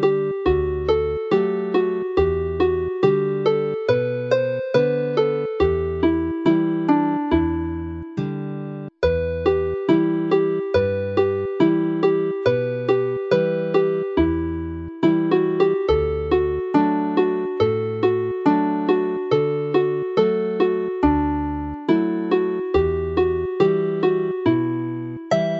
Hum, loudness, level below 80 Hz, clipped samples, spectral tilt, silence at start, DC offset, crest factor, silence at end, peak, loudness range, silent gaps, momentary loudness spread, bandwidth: none; -21 LUFS; -38 dBFS; under 0.1%; -8.5 dB/octave; 0 s; under 0.1%; 16 dB; 0 s; -4 dBFS; 2 LU; none; 4 LU; 7 kHz